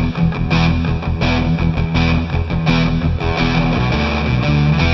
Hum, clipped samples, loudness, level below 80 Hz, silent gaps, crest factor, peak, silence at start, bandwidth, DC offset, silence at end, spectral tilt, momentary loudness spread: none; under 0.1%; -16 LUFS; -24 dBFS; none; 14 dB; -2 dBFS; 0 s; 6.2 kHz; under 0.1%; 0 s; -7.5 dB/octave; 3 LU